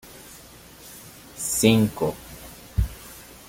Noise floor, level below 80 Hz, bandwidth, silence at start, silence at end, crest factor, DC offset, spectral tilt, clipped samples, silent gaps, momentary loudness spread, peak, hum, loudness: -46 dBFS; -38 dBFS; 17 kHz; 0.05 s; 0.25 s; 24 dB; under 0.1%; -4.5 dB/octave; under 0.1%; none; 25 LU; -4 dBFS; none; -23 LUFS